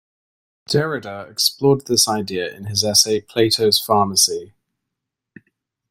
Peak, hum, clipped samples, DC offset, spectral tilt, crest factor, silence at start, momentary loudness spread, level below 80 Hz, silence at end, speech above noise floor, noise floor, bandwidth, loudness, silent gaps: 0 dBFS; none; under 0.1%; under 0.1%; -3 dB/octave; 20 dB; 0.7 s; 11 LU; -56 dBFS; 1.45 s; 63 dB; -81 dBFS; 16.5 kHz; -17 LUFS; none